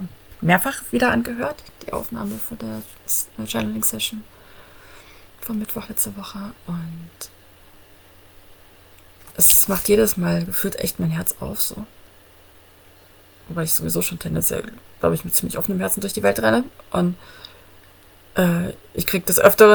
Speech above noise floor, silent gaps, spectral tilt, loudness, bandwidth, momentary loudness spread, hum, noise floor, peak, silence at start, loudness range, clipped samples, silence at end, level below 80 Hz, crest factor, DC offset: 29 dB; none; -4 dB/octave; -20 LUFS; over 20 kHz; 20 LU; none; -49 dBFS; 0 dBFS; 0 s; 11 LU; under 0.1%; 0 s; -48 dBFS; 22 dB; under 0.1%